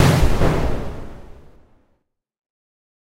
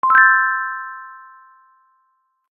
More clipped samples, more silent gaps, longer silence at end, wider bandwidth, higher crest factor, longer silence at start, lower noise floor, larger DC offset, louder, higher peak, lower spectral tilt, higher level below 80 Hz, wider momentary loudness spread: neither; neither; first, 1.7 s vs 1.35 s; first, 16 kHz vs 4.3 kHz; about the same, 20 dB vs 18 dB; about the same, 0 s vs 0.05 s; about the same, -67 dBFS vs -66 dBFS; neither; second, -20 LUFS vs -14 LUFS; about the same, 0 dBFS vs 0 dBFS; first, -6 dB/octave vs -2.5 dB/octave; first, -26 dBFS vs -86 dBFS; about the same, 23 LU vs 25 LU